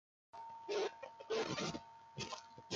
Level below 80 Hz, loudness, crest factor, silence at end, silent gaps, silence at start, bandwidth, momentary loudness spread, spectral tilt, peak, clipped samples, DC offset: -74 dBFS; -44 LUFS; 20 dB; 0 s; none; 0.35 s; 9.2 kHz; 14 LU; -3.5 dB/octave; -24 dBFS; under 0.1%; under 0.1%